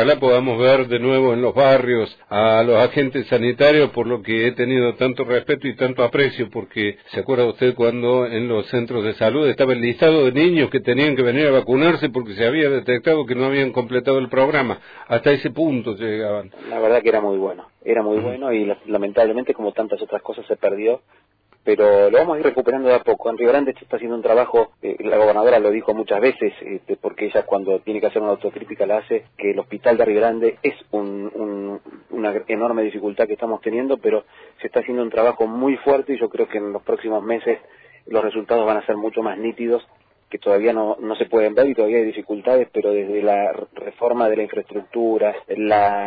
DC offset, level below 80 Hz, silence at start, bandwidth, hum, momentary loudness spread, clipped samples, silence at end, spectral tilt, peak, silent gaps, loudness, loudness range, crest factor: under 0.1%; -60 dBFS; 0 s; 5 kHz; none; 10 LU; under 0.1%; 0 s; -8.5 dB/octave; -4 dBFS; none; -19 LUFS; 5 LU; 14 dB